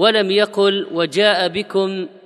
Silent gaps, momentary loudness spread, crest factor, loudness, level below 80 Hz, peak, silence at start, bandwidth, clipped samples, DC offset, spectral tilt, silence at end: none; 5 LU; 16 dB; -17 LUFS; -64 dBFS; 0 dBFS; 0 s; 11.5 kHz; under 0.1%; under 0.1%; -4.5 dB/octave; 0.15 s